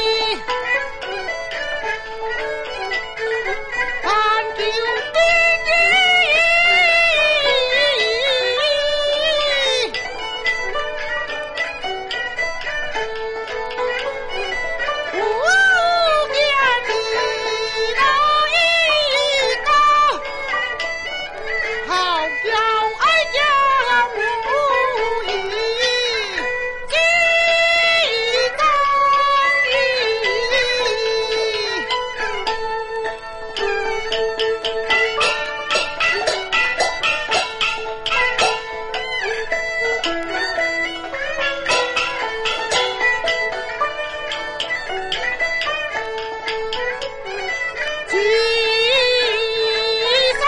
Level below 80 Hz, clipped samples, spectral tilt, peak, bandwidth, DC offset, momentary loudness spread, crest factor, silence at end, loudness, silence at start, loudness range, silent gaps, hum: -42 dBFS; under 0.1%; -1 dB/octave; -4 dBFS; 11.5 kHz; under 0.1%; 11 LU; 14 dB; 0 s; -17 LUFS; 0 s; 8 LU; none; none